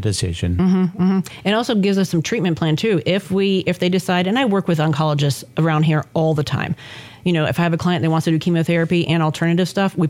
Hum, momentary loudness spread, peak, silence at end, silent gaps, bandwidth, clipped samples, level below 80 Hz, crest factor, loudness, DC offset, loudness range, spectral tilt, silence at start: none; 4 LU; -6 dBFS; 0 s; none; 16 kHz; under 0.1%; -50 dBFS; 12 dB; -18 LUFS; under 0.1%; 1 LU; -6.5 dB/octave; 0 s